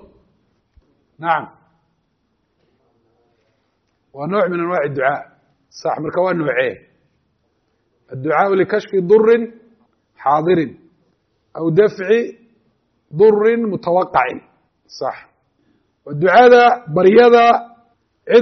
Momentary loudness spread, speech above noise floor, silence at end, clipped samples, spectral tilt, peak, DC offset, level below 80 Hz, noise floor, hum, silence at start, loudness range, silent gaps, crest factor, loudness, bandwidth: 17 LU; 52 dB; 0 s; under 0.1%; -4.5 dB/octave; 0 dBFS; under 0.1%; -60 dBFS; -66 dBFS; none; 1.2 s; 14 LU; none; 16 dB; -15 LUFS; 6.4 kHz